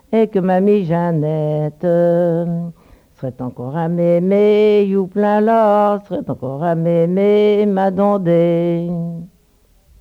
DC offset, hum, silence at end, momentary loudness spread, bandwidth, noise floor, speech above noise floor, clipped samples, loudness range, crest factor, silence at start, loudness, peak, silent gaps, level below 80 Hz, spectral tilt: under 0.1%; none; 0.75 s; 12 LU; 5.6 kHz; -54 dBFS; 39 dB; under 0.1%; 3 LU; 12 dB; 0.1 s; -15 LUFS; -4 dBFS; none; -54 dBFS; -9.5 dB/octave